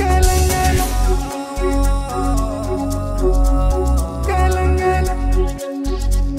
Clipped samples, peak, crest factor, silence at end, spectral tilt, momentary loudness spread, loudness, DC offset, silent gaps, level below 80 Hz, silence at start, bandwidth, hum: under 0.1%; 0 dBFS; 14 dB; 0 s; -5.5 dB/octave; 7 LU; -18 LUFS; under 0.1%; none; -18 dBFS; 0 s; 16 kHz; none